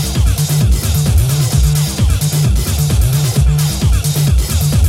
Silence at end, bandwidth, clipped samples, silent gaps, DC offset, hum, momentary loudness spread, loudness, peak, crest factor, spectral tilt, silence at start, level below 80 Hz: 0 s; 16.5 kHz; under 0.1%; none; under 0.1%; none; 1 LU; -13 LUFS; 0 dBFS; 10 dB; -5 dB/octave; 0 s; -16 dBFS